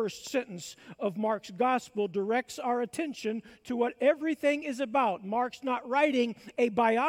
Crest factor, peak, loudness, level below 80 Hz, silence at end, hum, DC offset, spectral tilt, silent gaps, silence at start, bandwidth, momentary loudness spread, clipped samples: 18 dB; -12 dBFS; -30 LUFS; -74 dBFS; 0 s; none; under 0.1%; -4.5 dB/octave; none; 0 s; 16.5 kHz; 9 LU; under 0.1%